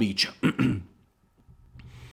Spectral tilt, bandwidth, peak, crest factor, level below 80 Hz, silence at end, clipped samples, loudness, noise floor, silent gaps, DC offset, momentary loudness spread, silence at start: -5 dB/octave; 16.5 kHz; -10 dBFS; 20 dB; -56 dBFS; 0 s; under 0.1%; -26 LUFS; -63 dBFS; none; under 0.1%; 23 LU; 0 s